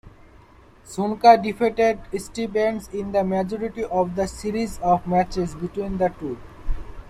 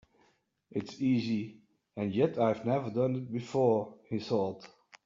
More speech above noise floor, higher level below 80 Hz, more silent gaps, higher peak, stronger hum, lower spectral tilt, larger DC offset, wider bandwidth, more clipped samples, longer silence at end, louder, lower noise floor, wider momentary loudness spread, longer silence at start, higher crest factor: second, 28 dB vs 40 dB; first, -38 dBFS vs -74 dBFS; neither; first, -2 dBFS vs -14 dBFS; neither; about the same, -6 dB/octave vs -7 dB/octave; neither; first, 13.5 kHz vs 7.4 kHz; neither; second, 0 s vs 0.4 s; first, -22 LUFS vs -32 LUFS; second, -50 dBFS vs -71 dBFS; first, 16 LU vs 11 LU; second, 0.05 s vs 0.75 s; about the same, 20 dB vs 18 dB